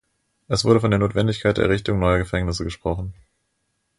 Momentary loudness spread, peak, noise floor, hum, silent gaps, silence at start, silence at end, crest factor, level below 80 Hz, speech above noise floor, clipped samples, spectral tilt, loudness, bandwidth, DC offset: 9 LU; -4 dBFS; -72 dBFS; none; none; 0.5 s; 0.85 s; 18 dB; -36 dBFS; 52 dB; under 0.1%; -6 dB/octave; -21 LUFS; 11.5 kHz; under 0.1%